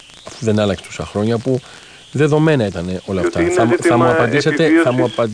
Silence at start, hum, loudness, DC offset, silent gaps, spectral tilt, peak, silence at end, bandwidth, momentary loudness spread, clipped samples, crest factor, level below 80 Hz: 0.25 s; none; -16 LUFS; under 0.1%; none; -6 dB/octave; -2 dBFS; 0 s; 10.5 kHz; 11 LU; under 0.1%; 14 dB; -46 dBFS